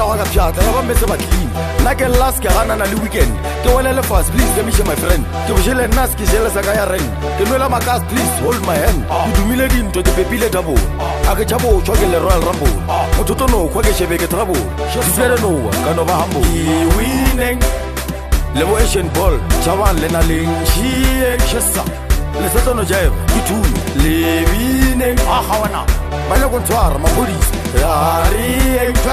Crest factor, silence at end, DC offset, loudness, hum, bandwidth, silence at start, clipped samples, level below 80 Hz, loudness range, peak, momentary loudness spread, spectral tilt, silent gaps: 14 dB; 0 s; 0.2%; -15 LUFS; none; 15 kHz; 0 s; under 0.1%; -18 dBFS; 1 LU; 0 dBFS; 4 LU; -5 dB/octave; none